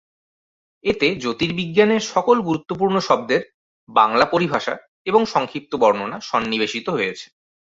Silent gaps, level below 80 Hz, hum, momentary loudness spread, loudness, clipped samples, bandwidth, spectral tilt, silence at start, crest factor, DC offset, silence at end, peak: 3.54-3.87 s, 4.88-5.05 s; -56 dBFS; none; 8 LU; -20 LUFS; under 0.1%; 7.8 kHz; -5 dB/octave; 0.85 s; 20 dB; under 0.1%; 0.5 s; 0 dBFS